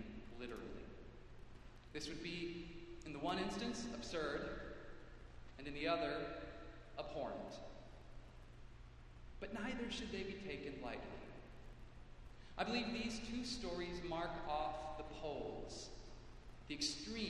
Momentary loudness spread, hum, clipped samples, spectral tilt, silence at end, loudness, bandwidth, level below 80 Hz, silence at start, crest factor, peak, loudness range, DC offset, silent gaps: 19 LU; none; under 0.1%; -4 dB/octave; 0 s; -46 LUFS; 12 kHz; -60 dBFS; 0 s; 22 dB; -24 dBFS; 5 LU; under 0.1%; none